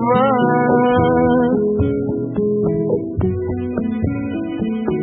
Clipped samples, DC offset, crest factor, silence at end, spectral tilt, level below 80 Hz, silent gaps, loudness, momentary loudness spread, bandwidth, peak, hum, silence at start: under 0.1%; under 0.1%; 14 dB; 0 s; -13 dB/octave; -38 dBFS; none; -18 LUFS; 8 LU; 4 kHz; -2 dBFS; none; 0 s